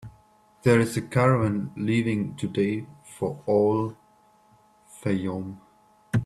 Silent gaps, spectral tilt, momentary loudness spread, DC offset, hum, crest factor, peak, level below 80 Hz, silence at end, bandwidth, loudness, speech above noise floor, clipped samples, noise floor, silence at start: none; -7 dB/octave; 12 LU; under 0.1%; none; 20 dB; -6 dBFS; -58 dBFS; 0 s; 13.5 kHz; -25 LUFS; 35 dB; under 0.1%; -59 dBFS; 0.05 s